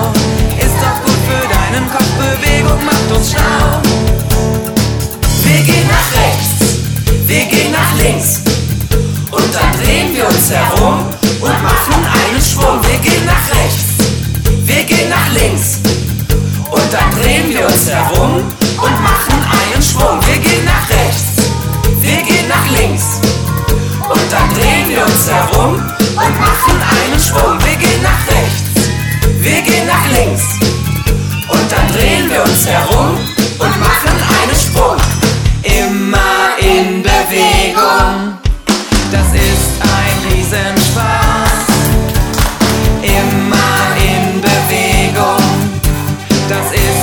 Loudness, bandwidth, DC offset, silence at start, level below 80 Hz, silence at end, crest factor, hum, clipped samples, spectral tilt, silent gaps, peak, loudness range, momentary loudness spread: -11 LUFS; over 20 kHz; under 0.1%; 0 s; -18 dBFS; 0 s; 10 dB; none; under 0.1%; -4 dB/octave; none; 0 dBFS; 1 LU; 4 LU